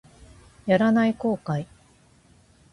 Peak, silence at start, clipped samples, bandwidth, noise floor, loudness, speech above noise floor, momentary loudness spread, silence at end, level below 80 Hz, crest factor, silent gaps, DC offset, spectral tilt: -8 dBFS; 0.65 s; under 0.1%; 11 kHz; -57 dBFS; -23 LUFS; 35 dB; 15 LU; 1.1 s; -58 dBFS; 18 dB; none; under 0.1%; -7.5 dB/octave